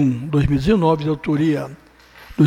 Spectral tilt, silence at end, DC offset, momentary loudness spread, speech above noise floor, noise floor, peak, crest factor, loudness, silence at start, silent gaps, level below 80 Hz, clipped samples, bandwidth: -8.5 dB/octave; 0 s; under 0.1%; 11 LU; 25 dB; -43 dBFS; -4 dBFS; 14 dB; -19 LUFS; 0 s; none; -36 dBFS; under 0.1%; 12 kHz